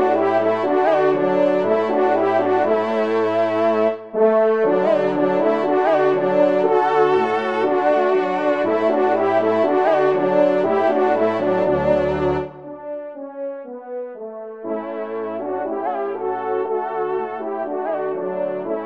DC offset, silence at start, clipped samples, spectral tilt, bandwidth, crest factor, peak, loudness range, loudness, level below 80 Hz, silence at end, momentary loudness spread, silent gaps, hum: 0.3%; 0 s; under 0.1%; -7.5 dB/octave; 7.4 kHz; 14 dB; -4 dBFS; 9 LU; -19 LUFS; -54 dBFS; 0 s; 13 LU; none; none